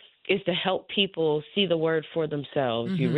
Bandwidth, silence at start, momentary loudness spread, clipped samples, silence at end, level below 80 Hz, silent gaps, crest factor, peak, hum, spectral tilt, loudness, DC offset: 4.9 kHz; 0.3 s; 4 LU; under 0.1%; 0 s; -66 dBFS; none; 18 dB; -8 dBFS; none; -8 dB/octave; -26 LUFS; under 0.1%